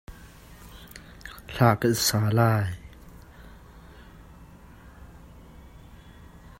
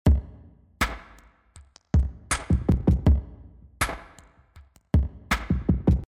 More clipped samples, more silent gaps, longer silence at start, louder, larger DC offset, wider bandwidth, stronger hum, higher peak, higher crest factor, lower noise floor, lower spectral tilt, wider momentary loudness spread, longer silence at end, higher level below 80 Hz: neither; neither; about the same, 0.1 s vs 0.05 s; first, -23 LUFS vs -26 LUFS; neither; about the same, 16 kHz vs 16 kHz; neither; first, -4 dBFS vs -10 dBFS; first, 24 dB vs 14 dB; second, -48 dBFS vs -54 dBFS; about the same, -5 dB/octave vs -6 dB/octave; first, 27 LU vs 7 LU; about the same, 0.1 s vs 0.05 s; second, -50 dBFS vs -28 dBFS